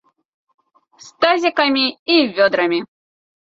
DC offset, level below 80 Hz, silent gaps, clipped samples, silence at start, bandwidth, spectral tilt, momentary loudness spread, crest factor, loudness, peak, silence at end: under 0.1%; -66 dBFS; 1.99-2.06 s; under 0.1%; 1.05 s; 7.6 kHz; -4 dB/octave; 4 LU; 18 dB; -16 LUFS; 0 dBFS; 0.65 s